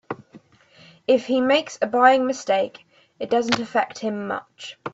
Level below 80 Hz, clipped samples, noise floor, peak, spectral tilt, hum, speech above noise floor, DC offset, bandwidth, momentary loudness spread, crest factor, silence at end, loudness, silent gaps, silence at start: -68 dBFS; under 0.1%; -53 dBFS; -2 dBFS; -4 dB/octave; none; 32 dB; under 0.1%; 8 kHz; 18 LU; 22 dB; 0.05 s; -21 LUFS; none; 0.1 s